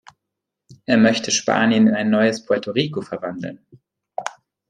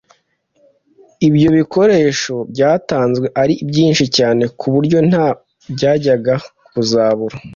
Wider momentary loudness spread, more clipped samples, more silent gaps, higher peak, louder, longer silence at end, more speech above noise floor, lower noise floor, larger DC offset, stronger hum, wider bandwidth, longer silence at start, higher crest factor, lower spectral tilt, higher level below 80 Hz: first, 17 LU vs 8 LU; neither; neither; about the same, -2 dBFS vs -2 dBFS; second, -18 LUFS vs -14 LUFS; first, 0.4 s vs 0 s; first, 63 dB vs 46 dB; first, -82 dBFS vs -60 dBFS; neither; neither; first, 9.8 kHz vs 7.6 kHz; second, 0.7 s vs 1.2 s; first, 18 dB vs 12 dB; second, -4 dB/octave vs -6 dB/octave; second, -64 dBFS vs -50 dBFS